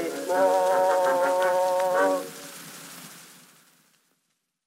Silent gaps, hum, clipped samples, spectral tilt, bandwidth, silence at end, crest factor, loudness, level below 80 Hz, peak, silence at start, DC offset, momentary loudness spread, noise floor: none; none; under 0.1%; -3 dB/octave; 16 kHz; 1.45 s; 14 dB; -23 LUFS; -86 dBFS; -12 dBFS; 0 s; under 0.1%; 19 LU; -76 dBFS